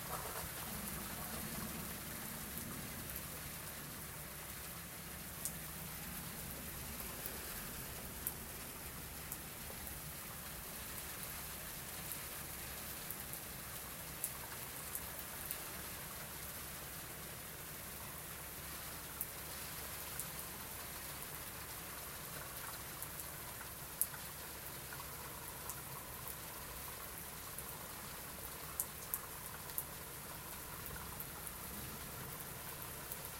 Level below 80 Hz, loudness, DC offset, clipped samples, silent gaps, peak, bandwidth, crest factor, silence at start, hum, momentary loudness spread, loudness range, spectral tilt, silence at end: -60 dBFS; -45 LUFS; under 0.1%; under 0.1%; none; -12 dBFS; 17 kHz; 36 dB; 0 s; none; 4 LU; 2 LU; -2.5 dB/octave; 0 s